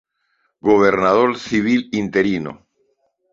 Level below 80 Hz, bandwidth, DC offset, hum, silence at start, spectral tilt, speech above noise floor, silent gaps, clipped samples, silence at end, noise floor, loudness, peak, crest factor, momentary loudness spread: -52 dBFS; 7.6 kHz; under 0.1%; none; 0.65 s; -6 dB/octave; 51 dB; none; under 0.1%; 0.75 s; -67 dBFS; -17 LUFS; -2 dBFS; 18 dB; 9 LU